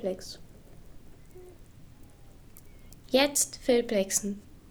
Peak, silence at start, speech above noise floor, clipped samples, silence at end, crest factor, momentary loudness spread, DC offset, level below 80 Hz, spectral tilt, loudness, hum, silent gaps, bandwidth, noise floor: -10 dBFS; 0 s; 23 dB; under 0.1%; 0.1 s; 22 dB; 19 LU; under 0.1%; -54 dBFS; -2.5 dB/octave; -27 LUFS; none; none; over 20 kHz; -51 dBFS